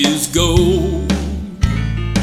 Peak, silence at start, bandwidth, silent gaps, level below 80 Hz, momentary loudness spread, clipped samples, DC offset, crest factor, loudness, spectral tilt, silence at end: 0 dBFS; 0 s; 17 kHz; none; -22 dBFS; 7 LU; under 0.1%; under 0.1%; 16 dB; -16 LUFS; -5 dB/octave; 0 s